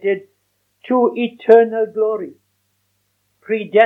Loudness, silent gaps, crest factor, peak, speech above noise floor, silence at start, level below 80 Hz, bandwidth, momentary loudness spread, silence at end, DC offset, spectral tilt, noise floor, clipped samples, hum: -17 LUFS; none; 18 dB; 0 dBFS; 52 dB; 0.05 s; -78 dBFS; 4 kHz; 13 LU; 0 s; under 0.1%; -7.5 dB/octave; -67 dBFS; under 0.1%; none